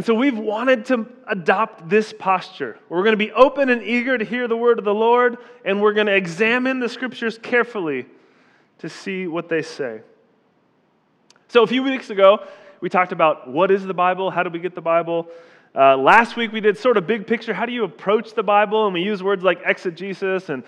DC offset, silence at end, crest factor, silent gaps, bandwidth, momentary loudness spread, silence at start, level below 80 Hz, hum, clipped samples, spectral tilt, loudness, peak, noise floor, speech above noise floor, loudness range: under 0.1%; 0.05 s; 20 dB; none; 9.8 kHz; 11 LU; 0 s; -64 dBFS; none; under 0.1%; -5.5 dB/octave; -19 LUFS; 0 dBFS; -61 dBFS; 43 dB; 7 LU